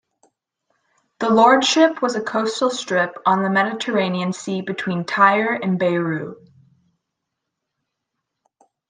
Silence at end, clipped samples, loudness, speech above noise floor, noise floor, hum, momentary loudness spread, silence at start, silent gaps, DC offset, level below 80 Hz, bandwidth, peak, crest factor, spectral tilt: 2.55 s; under 0.1%; -19 LUFS; 61 dB; -80 dBFS; none; 11 LU; 1.2 s; none; under 0.1%; -70 dBFS; 9.8 kHz; -2 dBFS; 20 dB; -4.5 dB/octave